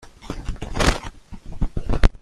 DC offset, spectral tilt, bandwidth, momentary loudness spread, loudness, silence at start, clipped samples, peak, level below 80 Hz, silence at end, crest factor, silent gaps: under 0.1%; -4.5 dB/octave; 12.5 kHz; 18 LU; -25 LUFS; 0.05 s; under 0.1%; 0 dBFS; -24 dBFS; 0.05 s; 20 dB; none